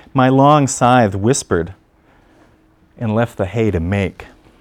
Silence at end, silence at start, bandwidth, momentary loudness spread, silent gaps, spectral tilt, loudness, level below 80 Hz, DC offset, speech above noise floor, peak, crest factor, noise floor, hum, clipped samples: 0.35 s; 0.15 s; 14 kHz; 9 LU; none; -6 dB/octave; -15 LUFS; -42 dBFS; under 0.1%; 38 dB; 0 dBFS; 16 dB; -52 dBFS; none; under 0.1%